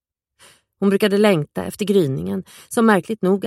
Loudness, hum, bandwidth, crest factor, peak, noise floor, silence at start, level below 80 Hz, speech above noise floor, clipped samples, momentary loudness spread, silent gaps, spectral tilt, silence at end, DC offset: -19 LUFS; none; 15 kHz; 18 dB; -2 dBFS; -54 dBFS; 0.8 s; -58 dBFS; 35 dB; under 0.1%; 11 LU; none; -6 dB/octave; 0 s; under 0.1%